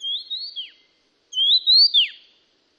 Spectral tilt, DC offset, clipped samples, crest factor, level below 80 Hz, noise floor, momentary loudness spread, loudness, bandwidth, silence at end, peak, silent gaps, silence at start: 5 dB/octave; under 0.1%; under 0.1%; 14 dB; -88 dBFS; -64 dBFS; 20 LU; -15 LUFS; 12 kHz; 0.65 s; -8 dBFS; none; 0 s